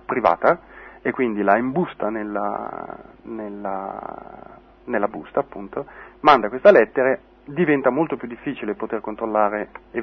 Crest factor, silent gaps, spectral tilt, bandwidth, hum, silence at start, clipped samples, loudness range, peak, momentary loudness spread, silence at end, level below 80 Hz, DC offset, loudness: 20 dB; none; -8 dB/octave; 6.2 kHz; none; 0.1 s; under 0.1%; 10 LU; -2 dBFS; 18 LU; 0 s; -56 dBFS; under 0.1%; -21 LUFS